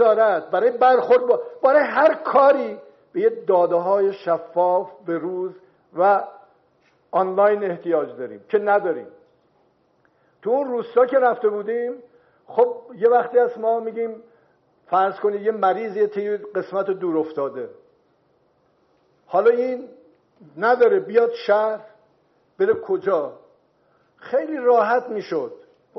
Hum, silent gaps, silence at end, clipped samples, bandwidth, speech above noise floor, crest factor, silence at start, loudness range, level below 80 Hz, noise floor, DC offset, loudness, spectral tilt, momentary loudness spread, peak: none; none; 0.45 s; under 0.1%; 6 kHz; 43 dB; 16 dB; 0 s; 6 LU; -78 dBFS; -63 dBFS; under 0.1%; -20 LUFS; -4 dB/octave; 13 LU; -4 dBFS